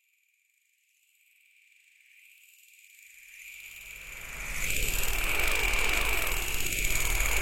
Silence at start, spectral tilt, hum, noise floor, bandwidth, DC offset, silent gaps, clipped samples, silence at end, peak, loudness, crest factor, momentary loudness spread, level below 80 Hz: 0 s; -1.5 dB/octave; none; -71 dBFS; 17 kHz; under 0.1%; none; under 0.1%; 0 s; -14 dBFS; -29 LUFS; 18 dB; 18 LU; -38 dBFS